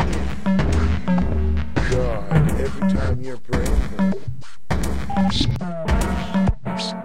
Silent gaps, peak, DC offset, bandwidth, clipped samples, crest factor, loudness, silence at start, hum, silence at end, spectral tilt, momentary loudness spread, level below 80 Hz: none; -4 dBFS; 6%; 15 kHz; under 0.1%; 16 dB; -22 LUFS; 0 s; none; 0 s; -6.5 dB/octave; 6 LU; -26 dBFS